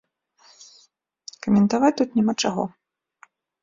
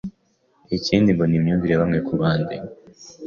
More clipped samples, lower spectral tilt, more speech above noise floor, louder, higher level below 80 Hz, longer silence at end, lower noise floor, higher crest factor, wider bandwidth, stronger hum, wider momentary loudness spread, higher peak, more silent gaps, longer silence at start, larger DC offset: neither; second, -5.5 dB/octave vs -7.5 dB/octave; about the same, 41 dB vs 44 dB; about the same, -22 LUFS vs -20 LUFS; second, -62 dBFS vs -46 dBFS; first, 0.95 s vs 0 s; about the same, -61 dBFS vs -63 dBFS; about the same, 20 dB vs 18 dB; about the same, 7.8 kHz vs 7.2 kHz; neither; first, 17 LU vs 14 LU; about the same, -6 dBFS vs -4 dBFS; neither; first, 1.45 s vs 0.05 s; neither